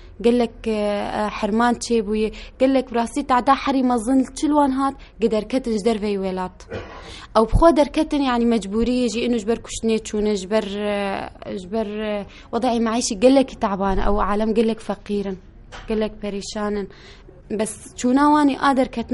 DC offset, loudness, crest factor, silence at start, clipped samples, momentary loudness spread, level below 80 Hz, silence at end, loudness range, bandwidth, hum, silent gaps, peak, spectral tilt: under 0.1%; -21 LUFS; 18 dB; 0 s; under 0.1%; 12 LU; -36 dBFS; 0 s; 4 LU; 11.5 kHz; none; none; -2 dBFS; -5 dB/octave